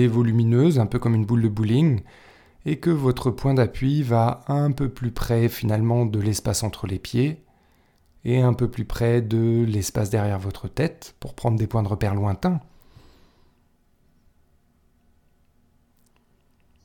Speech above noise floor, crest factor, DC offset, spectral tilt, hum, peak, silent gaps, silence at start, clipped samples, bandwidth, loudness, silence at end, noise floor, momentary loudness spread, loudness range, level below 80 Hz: 40 dB; 16 dB; under 0.1%; -7 dB/octave; none; -6 dBFS; none; 0 s; under 0.1%; 17.5 kHz; -23 LUFS; 4.25 s; -62 dBFS; 9 LU; 5 LU; -42 dBFS